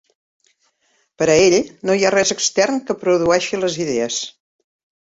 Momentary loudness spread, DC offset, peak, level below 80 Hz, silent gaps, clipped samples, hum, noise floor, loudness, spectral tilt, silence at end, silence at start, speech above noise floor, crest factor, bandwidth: 8 LU; under 0.1%; -2 dBFS; -54 dBFS; none; under 0.1%; none; -64 dBFS; -17 LUFS; -3 dB/octave; 0.75 s; 1.2 s; 47 dB; 16 dB; 8 kHz